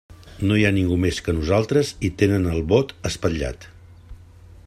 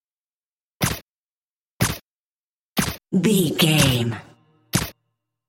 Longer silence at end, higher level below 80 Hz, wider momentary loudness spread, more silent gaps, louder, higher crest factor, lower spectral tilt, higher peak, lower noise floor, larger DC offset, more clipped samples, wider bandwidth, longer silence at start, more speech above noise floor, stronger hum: about the same, 0.5 s vs 0.55 s; about the same, -40 dBFS vs -44 dBFS; second, 8 LU vs 15 LU; second, none vs 1.02-1.80 s, 2.02-2.76 s; about the same, -21 LUFS vs -21 LUFS; about the same, 18 dB vs 20 dB; first, -6 dB/octave vs -4.5 dB/octave; about the same, -4 dBFS vs -4 dBFS; second, -45 dBFS vs under -90 dBFS; neither; neither; second, 14 kHz vs 17 kHz; second, 0.1 s vs 0.8 s; second, 25 dB vs over 72 dB; neither